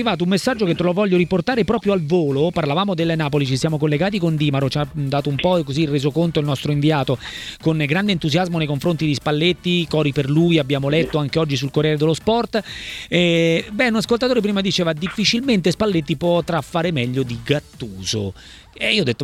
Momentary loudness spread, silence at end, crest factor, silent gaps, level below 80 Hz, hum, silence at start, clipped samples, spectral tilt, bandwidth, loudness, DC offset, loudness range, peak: 5 LU; 0 s; 16 dB; none; -46 dBFS; none; 0 s; under 0.1%; -6 dB/octave; 15 kHz; -19 LUFS; under 0.1%; 2 LU; -2 dBFS